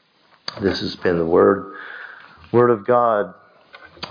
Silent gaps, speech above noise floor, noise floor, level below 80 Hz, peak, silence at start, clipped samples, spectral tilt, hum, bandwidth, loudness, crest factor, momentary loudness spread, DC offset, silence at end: none; 28 dB; -46 dBFS; -54 dBFS; -2 dBFS; 0.5 s; under 0.1%; -7 dB/octave; none; 5.2 kHz; -18 LUFS; 18 dB; 19 LU; under 0.1%; 0 s